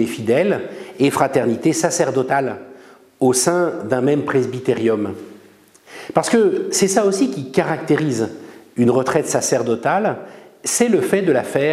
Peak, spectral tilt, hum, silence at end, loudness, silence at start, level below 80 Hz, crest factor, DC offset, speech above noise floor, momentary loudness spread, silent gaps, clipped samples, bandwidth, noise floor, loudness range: 0 dBFS; -4.5 dB/octave; none; 0 s; -18 LUFS; 0 s; -62 dBFS; 18 dB; under 0.1%; 31 dB; 10 LU; none; under 0.1%; 15.5 kHz; -48 dBFS; 2 LU